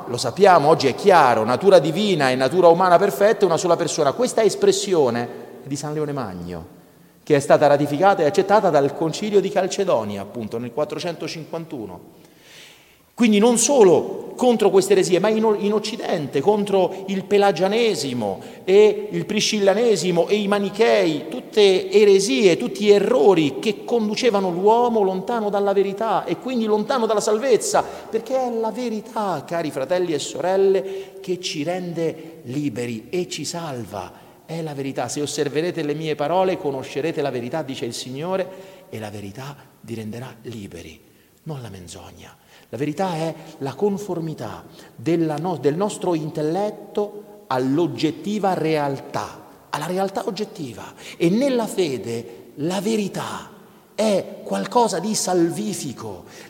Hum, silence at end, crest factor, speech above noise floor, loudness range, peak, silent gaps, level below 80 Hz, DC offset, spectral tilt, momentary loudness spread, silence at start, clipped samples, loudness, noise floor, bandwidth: none; 0 s; 20 dB; 31 dB; 11 LU; -2 dBFS; none; -64 dBFS; under 0.1%; -4.5 dB/octave; 17 LU; 0 s; under 0.1%; -20 LUFS; -51 dBFS; 17 kHz